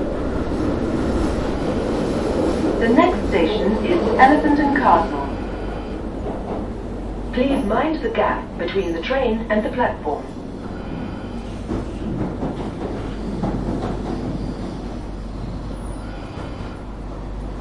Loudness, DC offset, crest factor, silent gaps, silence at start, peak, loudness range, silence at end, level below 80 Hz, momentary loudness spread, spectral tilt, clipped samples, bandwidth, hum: -22 LUFS; under 0.1%; 20 dB; none; 0 s; 0 dBFS; 11 LU; 0 s; -32 dBFS; 15 LU; -7 dB/octave; under 0.1%; 11.5 kHz; none